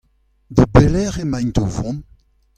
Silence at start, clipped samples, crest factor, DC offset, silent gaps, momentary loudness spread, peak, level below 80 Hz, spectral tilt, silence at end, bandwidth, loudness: 0.5 s; under 0.1%; 18 dB; under 0.1%; none; 13 LU; 0 dBFS; -28 dBFS; -7.5 dB/octave; 0.55 s; 9.8 kHz; -17 LUFS